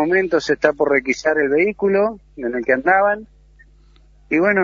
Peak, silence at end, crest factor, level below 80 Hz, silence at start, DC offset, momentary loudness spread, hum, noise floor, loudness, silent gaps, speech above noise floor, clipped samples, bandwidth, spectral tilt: 0 dBFS; 0 s; 18 dB; -50 dBFS; 0 s; under 0.1%; 8 LU; none; -49 dBFS; -18 LUFS; none; 32 dB; under 0.1%; 7.6 kHz; -5.5 dB/octave